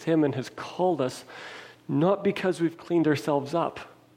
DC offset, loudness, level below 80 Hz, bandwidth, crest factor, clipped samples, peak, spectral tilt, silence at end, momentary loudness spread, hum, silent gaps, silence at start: under 0.1%; -27 LUFS; -70 dBFS; 15.5 kHz; 16 dB; under 0.1%; -10 dBFS; -6.5 dB/octave; 0.3 s; 17 LU; none; none; 0 s